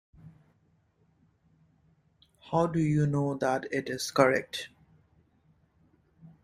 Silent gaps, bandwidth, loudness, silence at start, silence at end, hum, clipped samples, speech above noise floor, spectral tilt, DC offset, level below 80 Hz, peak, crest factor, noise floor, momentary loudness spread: none; 15.5 kHz; -28 LUFS; 0.25 s; 0.15 s; none; under 0.1%; 41 dB; -6 dB/octave; under 0.1%; -64 dBFS; -8 dBFS; 24 dB; -69 dBFS; 12 LU